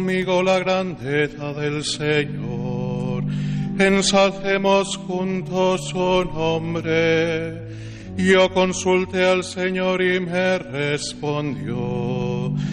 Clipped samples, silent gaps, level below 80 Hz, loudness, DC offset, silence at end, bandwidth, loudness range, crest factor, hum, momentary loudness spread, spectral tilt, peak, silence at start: under 0.1%; none; -46 dBFS; -21 LUFS; under 0.1%; 0 s; 11 kHz; 3 LU; 16 dB; none; 9 LU; -5 dB/octave; -4 dBFS; 0 s